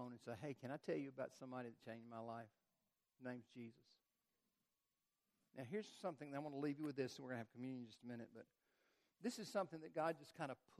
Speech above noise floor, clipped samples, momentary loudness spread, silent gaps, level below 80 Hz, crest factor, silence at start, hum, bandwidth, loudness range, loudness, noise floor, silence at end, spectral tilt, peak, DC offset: over 40 dB; under 0.1%; 11 LU; none; under -90 dBFS; 22 dB; 0 s; none; 13.5 kHz; 9 LU; -51 LUFS; under -90 dBFS; 0.05 s; -6 dB/octave; -30 dBFS; under 0.1%